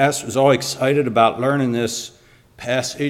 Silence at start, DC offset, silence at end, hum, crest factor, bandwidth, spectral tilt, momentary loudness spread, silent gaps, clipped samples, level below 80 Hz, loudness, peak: 0 s; under 0.1%; 0 s; none; 18 dB; 16.5 kHz; -4.5 dB/octave; 10 LU; none; under 0.1%; -58 dBFS; -18 LUFS; -2 dBFS